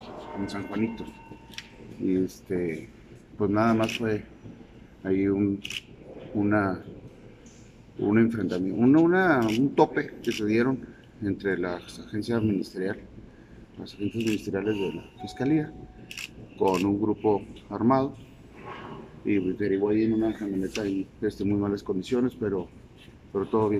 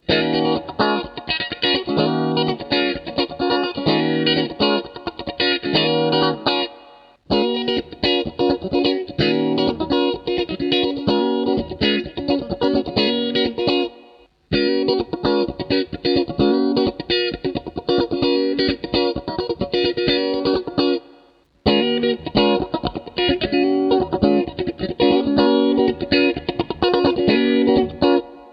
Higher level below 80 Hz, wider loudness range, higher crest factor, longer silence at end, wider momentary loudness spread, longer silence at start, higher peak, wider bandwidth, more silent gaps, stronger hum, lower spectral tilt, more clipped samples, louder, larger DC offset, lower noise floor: second, -56 dBFS vs -44 dBFS; first, 7 LU vs 3 LU; about the same, 22 dB vs 18 dB; about the same, 0 s vs 0 s; first, 19 LU vs 6 LU; about the same, 0 s vs 0.1 s; second, -6 dBFS vs -2 dBFS; first, 14.5 kHz vs 6 kHz; neither; neither; about the same, -7 dB/octave vs -7.5 dB/octave; neither; second, -27 LUFS vs -19 LUFS; neither; about the same, -50 dBFS vs -53 dBFS